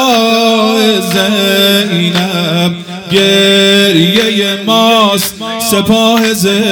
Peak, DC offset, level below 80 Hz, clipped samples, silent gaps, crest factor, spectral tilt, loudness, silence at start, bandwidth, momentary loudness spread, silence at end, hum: 0 dBFS; under 0.1%; -50 dBFS; 0.4%; none; 10 dB; -4 dB/octave; -9 LUFS; 0 s; over 20 kHz; 6 LU; 0 s; none